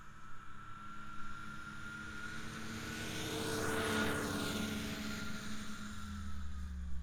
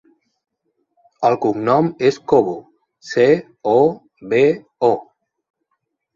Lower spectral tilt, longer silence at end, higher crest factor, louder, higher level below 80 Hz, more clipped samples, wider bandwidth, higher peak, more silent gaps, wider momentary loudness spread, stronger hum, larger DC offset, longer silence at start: second, -4 dB/octave vs -7 dB/octave; second, 0 s vs 1.1 s; about the same, 16 dB vs 18 dB; second, -41 LUFS vs -17 LUFS; first, -52 dBFS vs -60 dBFS; neither; first, over 20 kHz vs 7.4 kHz; second, -24 dBFS vs -2 dBFS; neither; first, 14 LU vs 9 LU; neither; neither; second, 0 s vs 1.2 s